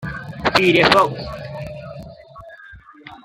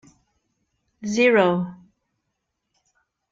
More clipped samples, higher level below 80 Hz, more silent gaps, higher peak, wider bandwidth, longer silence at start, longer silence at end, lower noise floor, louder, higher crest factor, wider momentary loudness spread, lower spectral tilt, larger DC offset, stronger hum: neither; first, -44 dBFS vs -68 dBFS; neither; first, -2 dBFS vs -6 dBFS; first, 16 kHz vs 7.6 kHz; second, 0 s vs 1 s; second, 0.1 s vs 1.55 s; second, -43 dBFS vs -78 dBFS; first, -15 LUFS vs -19 LUFS; about the same, 20 dB vs 20 dB; first, 24 LU vs 17 LU; about the same, -5 dB/octave vs -5.5 dB/octave; neither; neither